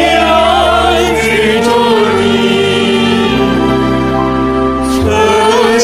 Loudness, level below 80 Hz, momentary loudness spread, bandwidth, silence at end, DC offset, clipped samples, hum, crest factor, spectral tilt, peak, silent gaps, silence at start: -10 LUFS; -28 dBFS; 4 LU; 16 kHz; 0 s; 0.4%; under 0.1%; none; 10 dB; -4.5 dB/octave; 0 dBFS; none; 0 s